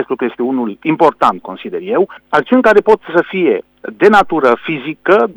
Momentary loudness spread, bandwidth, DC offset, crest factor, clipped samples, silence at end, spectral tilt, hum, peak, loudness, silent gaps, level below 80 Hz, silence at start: 10 LU; over 20 kHz; under 0.1%; 12 dB; 0.2%; 0.05 s; -6.5 dB/octave; none; 0 dBFS; -13 LUFS; none; -50 dBFS; 0 s